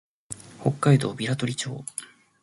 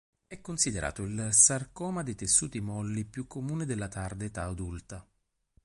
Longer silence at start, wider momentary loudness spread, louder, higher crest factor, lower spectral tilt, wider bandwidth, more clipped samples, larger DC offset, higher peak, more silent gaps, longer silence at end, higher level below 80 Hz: about the same, 0.3 s vs 0.3 s; about the same, 18 LU vs 18 LU; first, -25 LUFS vs -29 LUFS; about the same, 20 dB vs 24 dB; first, -5.5 dB/octave vs -3 dB/octave; about the same, 11.5 kHz vs 11.5 kHz; neither; neither; about the same, -6 dBFS vs -8 dBFS; neither; second, 0.35 s vs 0.65 s; second, -62 dBFS vs -50 dBFS